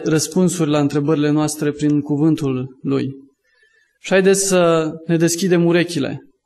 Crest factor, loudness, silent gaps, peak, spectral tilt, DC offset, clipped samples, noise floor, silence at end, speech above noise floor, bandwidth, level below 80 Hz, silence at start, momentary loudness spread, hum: 14 dB; -17 LUFS; none; -2 dBFS; -5.5 dB/octave; under 0.1%; under 0.1%; -58 dBFS; 0.25 s; 42 dB; 13 kHz; -56 dBFS; 0 s; 8 LU; none